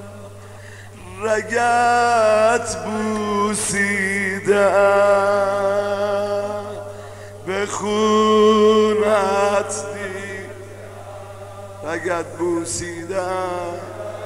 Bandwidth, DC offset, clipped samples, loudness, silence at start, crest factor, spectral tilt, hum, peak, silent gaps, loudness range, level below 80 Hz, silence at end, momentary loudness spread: 15.5 kHz; 0.4%; under 0.1%; -18 LUFS; 0 s; 16 dB; -4 dB/octave; 50 Hz at -40 dBFS; -4 dBFS; none; 8 LU; -54 dBFS; 0 s; 21 LU